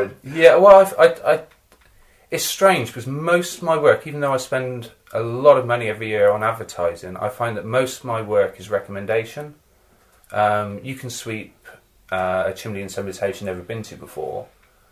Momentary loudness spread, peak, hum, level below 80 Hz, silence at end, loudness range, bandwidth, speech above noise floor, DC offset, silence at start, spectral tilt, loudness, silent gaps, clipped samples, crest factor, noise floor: 16 LU; 0 dBFS; none; -54 dBFS; 0.45 s; 10 LU; 16 kHz; 37 dB; under 0.1%; 0 s; -4.5 dB/octave; -19 LUFS; none; under 0.1%; 20 dB; -56 dBFS